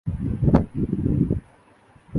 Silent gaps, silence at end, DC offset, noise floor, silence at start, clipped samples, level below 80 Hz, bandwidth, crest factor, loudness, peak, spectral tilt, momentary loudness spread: none; 0 s; under 0.1%; -54 dBFS; 0.05 s; under 0.1%; -34 dBFS; 4.9 kHz; 22 dB; -23 LUFS; -2 dBFS; -11 dB/octave; 7 LU